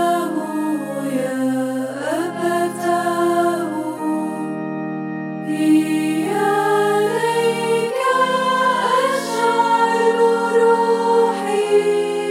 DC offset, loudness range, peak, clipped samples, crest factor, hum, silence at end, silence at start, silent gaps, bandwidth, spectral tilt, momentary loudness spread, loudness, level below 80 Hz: under 0.1%; 5 LU; -4 dBFS; under 0.1%; 14 dB; none; 0 s; 0 s; none; 16 kHz; -4.5 dB/octave; 8 LU; -18 LUFS; -70 dBFS